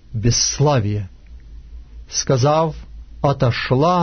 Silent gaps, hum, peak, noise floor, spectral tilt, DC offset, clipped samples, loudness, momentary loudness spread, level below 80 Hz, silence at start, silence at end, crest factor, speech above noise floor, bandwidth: none; none; -4 dBFS; -38 dBFS; -4.5 dB/octave; under 0.1%; under 0.1%; -18 LUFS; 9 LU; -36 dBFS; 0.1 s; 0 s; 14 dB; 21 dB; 6.6 kHz